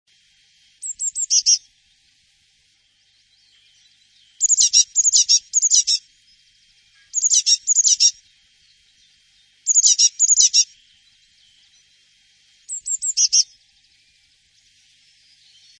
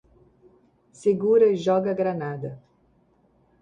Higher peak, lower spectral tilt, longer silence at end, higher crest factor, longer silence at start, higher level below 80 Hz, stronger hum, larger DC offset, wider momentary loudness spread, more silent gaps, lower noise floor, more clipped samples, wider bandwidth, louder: first, -2 dBFS vs -8 dBFS; second, 8 dB/octave vs -7.5 dB/octave; first, 2.35 s vs 1.05 s; about the same, 20 dB vs 16 dB; second, 0.85 s vs 1 s; second, -72 dBFS vs -66 dBFS; neither; neither; about the same, 13 LU vs 14 LU; neither; about the same, -61 dBFS vs -63 dBFS; neither; about the same, 10.5 kHz vs 9.6 kHz; first, -14 LUFS vs -23 LUFS